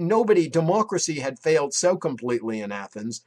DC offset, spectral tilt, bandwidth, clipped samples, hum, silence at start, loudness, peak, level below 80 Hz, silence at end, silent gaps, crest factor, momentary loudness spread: under 0.1%; -4.5 dB/octave; 12.5 kHz; under 0.1%; none; 0 s; -23 LUFS; -8 dBFS; -70 dBFS; 0.1 s; none; 16 dB; 11 LU